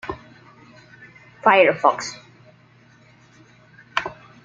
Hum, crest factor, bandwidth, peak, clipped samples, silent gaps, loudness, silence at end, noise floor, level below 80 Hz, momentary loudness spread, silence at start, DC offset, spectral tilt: none; 22 dB; 7.8 kHz; -2 dBFS; under 0.1%; none; -19 LUFS; 0.3 s; -53 dBFS; -60 dBFS; 22 LU; 0.05 s; under 0.1%; -3.5 dB/octave